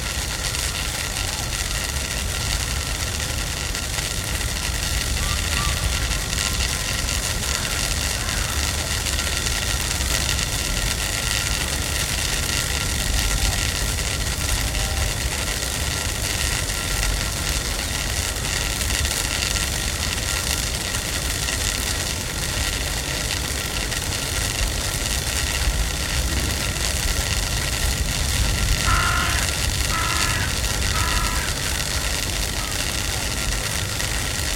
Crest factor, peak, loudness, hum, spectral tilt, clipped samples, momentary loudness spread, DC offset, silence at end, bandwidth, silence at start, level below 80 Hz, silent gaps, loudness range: 22 dB; 0 dBFS; -22 LUFS; none; -2 dB/octave; under 0.1%; 3 LU; under 0.1%; 0 s; 17 kHz; 0 s; -28 dBFS; none; 2 LU